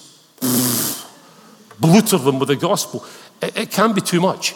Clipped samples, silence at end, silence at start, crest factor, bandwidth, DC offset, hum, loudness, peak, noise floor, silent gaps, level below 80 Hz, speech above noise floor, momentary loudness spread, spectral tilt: under 0.1%; 0 s; 0.4 s; 16 dB; over 20 kHz; under 0.1%; none; -17 LUFS; -2 dBFS; -46 dBFS; none; -66 dBFS; 29 dB; 12 LU; -4.5 dB/octave